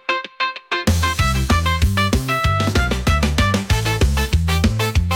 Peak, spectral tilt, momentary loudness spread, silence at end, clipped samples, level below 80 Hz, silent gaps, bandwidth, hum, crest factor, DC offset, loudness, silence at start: -6 dBFS; -5 dB/octave; 4 LU; 0 s; under 0.1%; -24 dBFS; none; 17 kHz; none; 12 dB; under 0.1%; -18 LUFS; 0.1 s